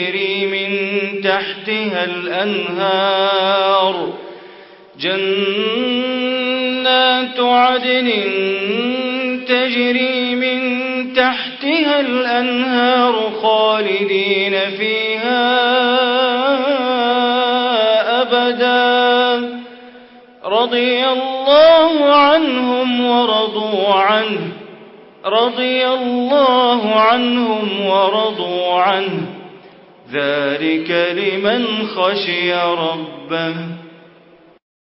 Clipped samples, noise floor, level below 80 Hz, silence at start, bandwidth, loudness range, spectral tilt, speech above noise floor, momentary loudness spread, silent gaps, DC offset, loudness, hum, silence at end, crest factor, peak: under 0.1%; -47 dBFS; -64 dBFS; 0 s; 5.8 kHz; 5 LU; -9 dB/octave; 31 dB; 7 LU; none; under 0.1%; -15 LUFS; none; 0.9 s; 14 dB; -2 dBFS